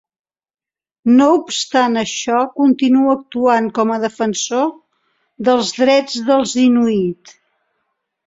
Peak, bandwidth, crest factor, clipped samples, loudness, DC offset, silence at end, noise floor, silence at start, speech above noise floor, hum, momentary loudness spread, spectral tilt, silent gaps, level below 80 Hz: -2 dBFS; 7.8 kHz; 14 dB; under 0.1%; -15 LUFS; under 0.1%; 1.15 s; under -90 dBFS; 1.05 s; over 76 dB; none; 7 LU; -4 dB/octave; none; -60 dBFS